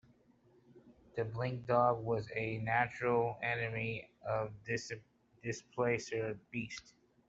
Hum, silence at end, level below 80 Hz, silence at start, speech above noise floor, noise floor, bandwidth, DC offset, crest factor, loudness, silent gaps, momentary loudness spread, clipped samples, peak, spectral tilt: none; 0.4 s; -68 dBFS; 0.75 s; 32 dB; -68 dBFS; 8 kHz; under 0.1%; 22 dB; -37 LUFS; none; 12 LU; under 0.1%; -16 dBFS; -6 dB/octave